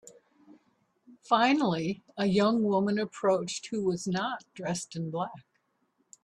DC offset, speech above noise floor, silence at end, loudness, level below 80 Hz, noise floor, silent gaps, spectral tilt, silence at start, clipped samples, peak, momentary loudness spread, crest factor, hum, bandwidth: under 0.1%; 46 dB; 0.85 s; -29 LUFS; -70 dBFS; -75 dBFS; none; -5 dB/octave; 1.1 s; under 0.1%; -10 dBFS; 10 LU; 20 dB; none; 11.5 kHz